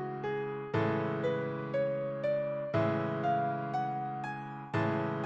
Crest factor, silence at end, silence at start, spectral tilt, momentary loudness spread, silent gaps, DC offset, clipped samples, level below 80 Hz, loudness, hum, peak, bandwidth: 16 dB; 0 s; 0 s; -8.5 dB/octave; 5 LU; none; under 0.1%; under 0.1%; -66 dBFS; -34 LUFS; none; -18 dBFS; 7.8 kHz